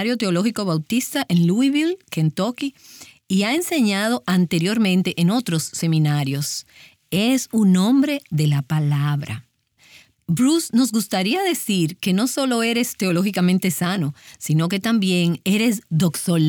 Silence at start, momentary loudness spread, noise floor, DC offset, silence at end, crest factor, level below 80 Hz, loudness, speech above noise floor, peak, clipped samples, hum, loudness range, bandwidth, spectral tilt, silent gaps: 0 s; 6 LU; -55 dBFS; under 0.1%; 0 s; 12 dB; -64 dBFS; -20 LUFS; 35 dB; -8 dBFS; under 0.1%; none; 2 LU; over 20 kHz; -5.5 dB/octave; none